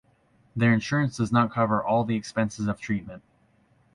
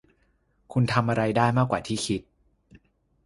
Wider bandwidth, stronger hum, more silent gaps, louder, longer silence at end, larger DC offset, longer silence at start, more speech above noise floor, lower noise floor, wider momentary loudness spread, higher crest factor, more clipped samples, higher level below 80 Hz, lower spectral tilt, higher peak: about the same, 11 kHz vs 11.5 kHz; neither; neither; about the same, -25 LUFS vs -25 LUFS; second, 0.75 s vs 1.05 s; neither; second, 0.55 s vs 0.7 s; second, 38 dB vs 43 dB; second, -63 dBFS vs -67 dBFS; about the same, 8 LU vs 8 LU; about the same, 18 dB vs 22 dB; neither; about the same, -56 dBFS vs -54 dBFS; about the same, -6.5 dB/octave vs -6 dB/octave; about the same, -8 dBFS vs -6 dBFS